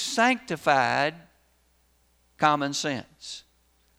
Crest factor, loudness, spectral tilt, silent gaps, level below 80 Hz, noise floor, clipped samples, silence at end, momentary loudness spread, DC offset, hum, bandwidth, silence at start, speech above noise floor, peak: 22 dB; -25 LUFS; -3.5 dB/octave; none; -66 dBFS; -65 dBFS; under 0.1%; 0.6 s; 17 LU; under 0.1%; none; over 20 kHz; 0 s; 40 dB; -6 dBFS